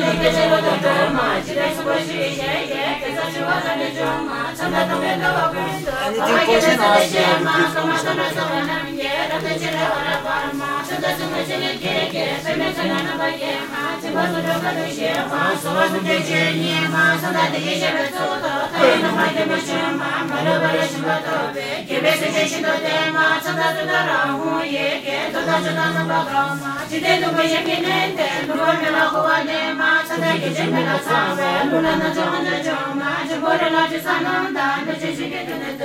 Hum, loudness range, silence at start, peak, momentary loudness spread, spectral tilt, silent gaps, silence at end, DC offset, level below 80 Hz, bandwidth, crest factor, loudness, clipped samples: none; 4 LU; 0 s; 0 dBFS; 6 LU; -4 dB/octave; none; 0 s; under 0.1%; -50 dBFS; 16 kHz; 20 dB; -19 LUFS; under 0.1%